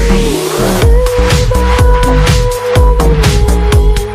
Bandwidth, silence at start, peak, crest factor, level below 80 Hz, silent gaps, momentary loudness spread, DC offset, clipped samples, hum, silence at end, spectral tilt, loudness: 15.5 kHz; 0 s; 0 dBFS; 8 dB; -10 dBFS; none; 3 LU; under 0.1%; 0.4%; none; 0 s; -5.5 dB/octave; -10 LUFS